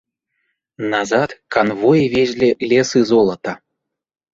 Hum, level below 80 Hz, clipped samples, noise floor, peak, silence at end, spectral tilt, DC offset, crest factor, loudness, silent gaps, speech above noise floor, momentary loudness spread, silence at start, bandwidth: none; -54 dBFS; under 0.1%; -78 dBFS; -2 dBFS; 0.75 s; -5.5 dB/octave; under 0.1%; 16 dB; -16 LUFS; none; 63 dB; 13 LU; 0.8 s; 7.8 kHz